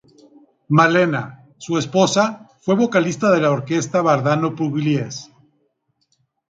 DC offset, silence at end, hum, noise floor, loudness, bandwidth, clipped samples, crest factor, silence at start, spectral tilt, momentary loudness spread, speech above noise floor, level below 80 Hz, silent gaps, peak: under 0.1%; 1.25 s; none; -68 dBFS; -18 LUFS; 9.4 kHz; under 0.1%; 18 dB; 0.7 s; -5.5 dB/octave; 12 LU; 50 dB; -62 dBFS; none; -2 dBFS